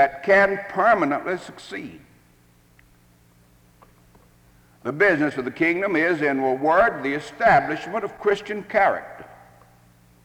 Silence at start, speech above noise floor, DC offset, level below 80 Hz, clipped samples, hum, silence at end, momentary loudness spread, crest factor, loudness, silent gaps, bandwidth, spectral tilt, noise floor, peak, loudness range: 0 s; 35 dB; under 0.1%; -56 dBFS; under 0.1%; none; 0.9 s; 17 LU; 18 dB; -21 LUFS; none; 18 kHz; -6 dB/octave; -56 dBFS; -6 dBFS; 12 LU